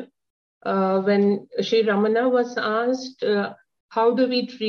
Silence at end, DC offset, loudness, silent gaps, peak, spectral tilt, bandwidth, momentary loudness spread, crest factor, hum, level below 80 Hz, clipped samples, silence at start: 0 s; under 0.1%; -22 LUFS; 0.30-0.61 s, 3.80-3.89 s; -8 dBFS; -6 dB/octave; 6.8 kHz; 7 LU; 14 dB; none; -74 dBFS; under 0.1%; 0 s